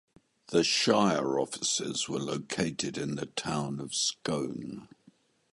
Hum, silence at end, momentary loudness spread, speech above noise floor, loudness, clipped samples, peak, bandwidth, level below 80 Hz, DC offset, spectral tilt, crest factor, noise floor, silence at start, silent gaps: none; 0.65 s; 10 LU; 33 dB; -30 LUFS; under 0.1%; -10 dBFS; 11.5 kHz; -66 dBFS; under 0.1%; -3.5 dB/octave; 20 dB; -64 dBFS; 0.5 s; none